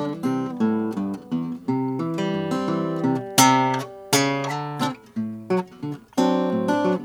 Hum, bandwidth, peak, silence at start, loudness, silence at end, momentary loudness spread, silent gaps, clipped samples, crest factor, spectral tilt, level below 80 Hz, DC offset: none; 19 kHz; 0 dBFS; 0 s; -23 LUFS; 0 s; 11 LU; none; under 0.1%; 22 dB; -4.5 dB/octave; -68 dBFS; under 0.1%